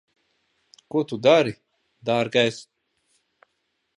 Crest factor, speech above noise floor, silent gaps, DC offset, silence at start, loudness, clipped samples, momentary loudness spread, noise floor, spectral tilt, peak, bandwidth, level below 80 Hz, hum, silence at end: 22 dB; 54 dB; none; under 0.1%; 0.95 s; -22 LUFS; under 0.1%; 17 LU; -75 dBFS; -5 dB/octave; -4 dBFS; 11 kHz; -70 dBFS; none; 1.35 s